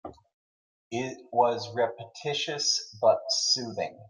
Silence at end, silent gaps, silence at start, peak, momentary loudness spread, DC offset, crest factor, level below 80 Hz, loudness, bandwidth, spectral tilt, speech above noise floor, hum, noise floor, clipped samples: 0 s; 0.34-0.91 s; 0.05 s; -10 dBFS; 10 LU; under 0.1%; 20 dB; -74 dBFS; -27 LUFS; 11 kHz; -2 dB/octave; over 62 dB; none; under -90 dBFS; under 0.1%